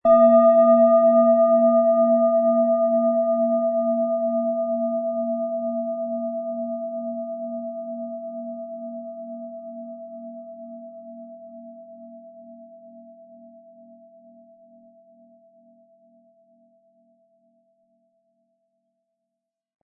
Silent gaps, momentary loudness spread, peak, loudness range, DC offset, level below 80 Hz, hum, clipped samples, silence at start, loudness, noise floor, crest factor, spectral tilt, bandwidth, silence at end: none; 25 LU; -6 dBFS; 25 LU; under 0.1%; -68 dBFS; none; under 0.1%; 0.05 s; -20 LUFS; -84 dBFS; 18 dB; -12 dB/octave; 2.8 kHz; 6.8 s